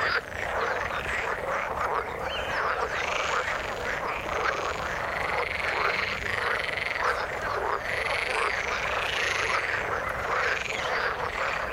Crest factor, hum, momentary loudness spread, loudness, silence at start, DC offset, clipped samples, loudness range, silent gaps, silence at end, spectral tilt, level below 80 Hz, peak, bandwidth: 18 dB; none; 4 LU; -28 LUFS; 0 s; under 0.1%; under 0.1%; 2 LU; none; 0 s; -3 dB/octave; -48 dBFS; -12 dBFS; 17 kHz